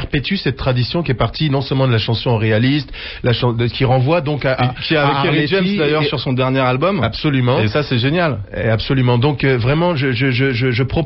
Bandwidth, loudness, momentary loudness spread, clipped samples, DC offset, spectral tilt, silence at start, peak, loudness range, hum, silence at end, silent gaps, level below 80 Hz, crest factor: 6 kHz; -16 LUFS; 4 LU; under 0.1%; under 0.1%; -9.5 dB/octave; 0 s; -4 dBFS; 1 LU; none; 0 s; none; -36 dBFS; 12 dB